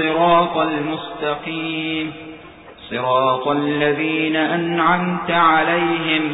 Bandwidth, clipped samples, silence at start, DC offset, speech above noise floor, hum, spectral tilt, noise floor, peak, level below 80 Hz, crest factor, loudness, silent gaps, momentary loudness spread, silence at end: 4 kHz; under 0.1%; 0 s; under 0.1%; 22 dB; none; -10.5 dB/octave; -40 dBFS; -4 dBFS; -56 dBFS; 14 dB; -18 LUFS; none; 10 LU; 0 s